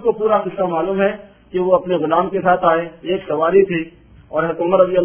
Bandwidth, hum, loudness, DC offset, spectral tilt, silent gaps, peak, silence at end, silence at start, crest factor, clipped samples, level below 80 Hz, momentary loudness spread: 3.5 kHz; none; -17 LUFS; under 0.1%; -10.5 dB/octave; none; 0 dBFS; 0 s; 0 s; 16 dB; under 0.1%; -52 dBFS; 9 LU